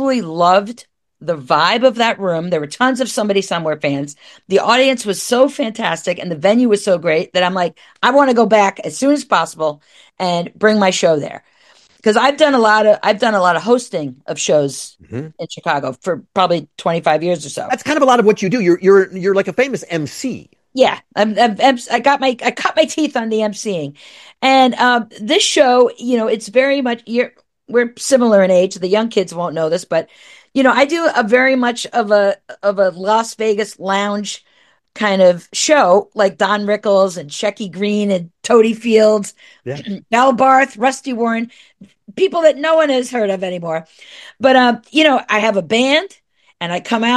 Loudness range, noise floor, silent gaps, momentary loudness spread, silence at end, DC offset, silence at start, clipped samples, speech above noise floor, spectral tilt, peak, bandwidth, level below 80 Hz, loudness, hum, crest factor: 3 LU; -50 dBFS; none; 11 LU; 0 s; under 0.1%; 0 s; under 0.1%; 36 dB; -4 dB/octave; 0 dBFS; 12.5 kHz; -64 dBFS; -15 LUFS; none; 14 dB